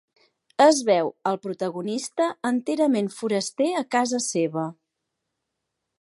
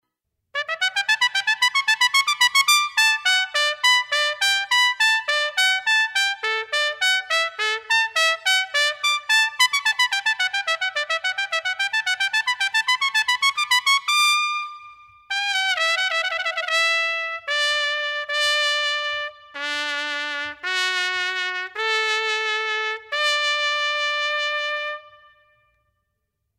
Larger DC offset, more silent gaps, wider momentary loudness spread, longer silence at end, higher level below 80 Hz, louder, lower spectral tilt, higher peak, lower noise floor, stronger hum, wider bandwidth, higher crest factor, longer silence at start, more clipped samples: neither; neither; first, 11 LU vs 8 LU; second, 1.3 s vs 1.5 s; second, -80 dBFS vs -74 dBFS; second, -24 LUFS vs -20 LUFS; first, -4 dB/octave vs 3 dB/octave; second, -6 dBFS vs -2 dBFS; about the same, -81 dBFS vs -78 dBFS; neither; second, 11.5 kHz vs 16 kHz; about the same, 20 dB vs 20 dB; about the same, 0.6 s vs 0.55 s; neither